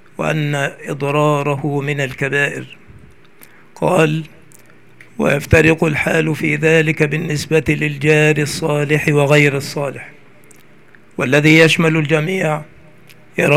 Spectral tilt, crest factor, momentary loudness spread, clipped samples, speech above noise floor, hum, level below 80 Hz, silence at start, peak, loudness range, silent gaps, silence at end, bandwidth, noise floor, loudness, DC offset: -5.5 dB/octave; 16 dB; 11 LU; under 0.1%; 32 dB; none; -44 dBFS; 0.2 s; 0 dBFS; 5 LU; none; 0 s; 15.5 kHz; -47 dBFS; -15 LUFS; 0.6%